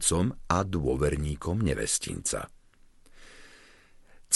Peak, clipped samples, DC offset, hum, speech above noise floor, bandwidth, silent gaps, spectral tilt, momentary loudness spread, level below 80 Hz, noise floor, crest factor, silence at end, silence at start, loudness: -8 dBFS; under 0.1%; under 0.1%; none; 28 dB; 12 kHz; none; -4.5 dB/octave; 7 LU; -42 dBFS; -57 dBFS; 22 dB; 0 s; 0 s; -29 LUFS